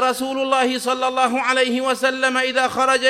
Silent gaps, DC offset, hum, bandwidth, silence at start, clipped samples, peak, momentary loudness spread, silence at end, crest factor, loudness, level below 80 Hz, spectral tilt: none; under 0.1%; none; 15.5 kHz; 0 s; under 0.1%; -2 dBFS; 3 LU; 0 s; 16 dB; -19 LUFS; -64 dBFS; -1.5 dB/octave